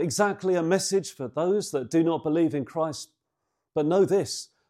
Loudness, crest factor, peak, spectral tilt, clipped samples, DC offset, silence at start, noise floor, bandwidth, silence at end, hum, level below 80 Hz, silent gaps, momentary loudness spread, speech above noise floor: -26 LUFS; 16 dB; -10 dBFS; -5 dB/octave; under 0.1%; under 0.1%; 0 s; -81 dBFS; 15.5 kHz; 0.25 s; none; -72 dBFS; none; 10 LU; 56 dB